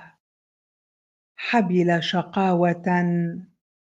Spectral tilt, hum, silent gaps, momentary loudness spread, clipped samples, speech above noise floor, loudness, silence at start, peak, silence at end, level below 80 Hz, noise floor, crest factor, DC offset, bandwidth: -7 dB/octave; none; 0.20-1.35 s; 9 LU; under 0.1%; over 69 dB; -22 LUFS; 0 s; -6 dBFS; 0.45 s; -70 dBFS; under -90 dBFS; 18 dB; under 0.1%; 7.6 kHz